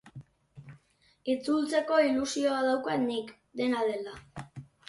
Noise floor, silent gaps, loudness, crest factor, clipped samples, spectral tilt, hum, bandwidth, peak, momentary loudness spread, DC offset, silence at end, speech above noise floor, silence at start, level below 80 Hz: -63 dBFS; none; -29 LUFS; 18 dB; under 0.1%; -4.5 dB/octave; none; 11.5 kHz; -14 dBFS; 18 LU; under 0.1%; 0.25 s; 35 dB; 0.05 s; -66 dBFS